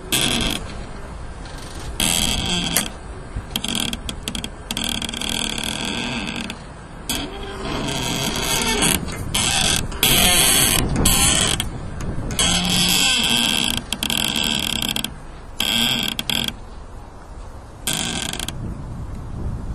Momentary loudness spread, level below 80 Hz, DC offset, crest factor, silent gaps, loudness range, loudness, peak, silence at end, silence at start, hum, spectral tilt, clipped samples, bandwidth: 20 LU; -32 dBFS; under 0.1%; 22 dB; none; 9 LU; -19 LUFS; 0 dBFS; 0 s; 0 s; none; -2 dB/octave; under 0.1%; 14 kHz